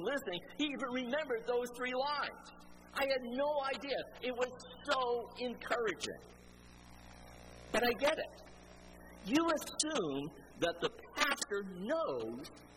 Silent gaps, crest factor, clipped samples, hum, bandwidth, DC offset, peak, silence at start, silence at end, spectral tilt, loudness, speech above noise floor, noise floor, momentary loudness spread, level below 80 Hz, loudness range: none; 20 dB; under 0.1%; 60 Hz at -60 dBFS; 16 kHz; under 0.1%; -18 dBFS; 0 s; 0 s; -3 dB/octave; -37 LUFS; 20 dB; -57 dBFS; 22 LU; -64 dBFS; 3 LU